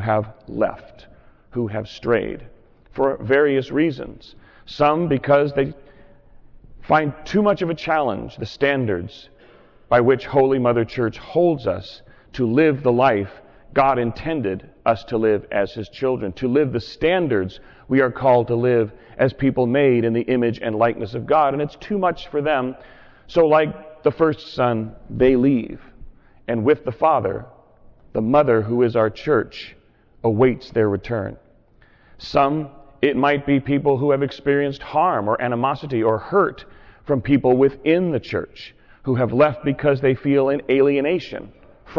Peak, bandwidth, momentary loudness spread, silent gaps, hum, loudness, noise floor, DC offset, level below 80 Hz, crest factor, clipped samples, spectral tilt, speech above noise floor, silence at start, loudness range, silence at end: -6 dBFS; 6 kHz; 12 LU; none; none; -20 LUFS; -53 dBFS; under 0.1%; -48 dBFS; 14 dB; under 0.1%; -8.5 dB/octave; 34 dB; 0 s; 3 LU; 0 s